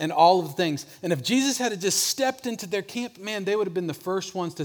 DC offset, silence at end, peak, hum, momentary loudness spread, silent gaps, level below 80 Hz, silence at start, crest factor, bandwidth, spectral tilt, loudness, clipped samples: under 0.1%; 0 s; -4 dBFS; none; 12 LU; none; -74 dBFS; 0 s; 20 dB; over 20 kHz; -3.5 dB/octave; -25 LUFS; under 0.1%